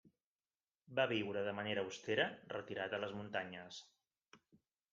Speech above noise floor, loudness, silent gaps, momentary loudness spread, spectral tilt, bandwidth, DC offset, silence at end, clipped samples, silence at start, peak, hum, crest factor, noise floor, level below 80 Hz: over 49 dB; -41 LUFS; 0.26-0.39 s, 0.55-0.60 s, 0.75-0.79 s; 11 LU; -4.5 dB/octave; 7.6 kHz; under 0.1%; 0.55 s; under 0.1%; 0.05 s; -22 dBFS; none; 22 dB; under -90 dBFS; -84 dBFS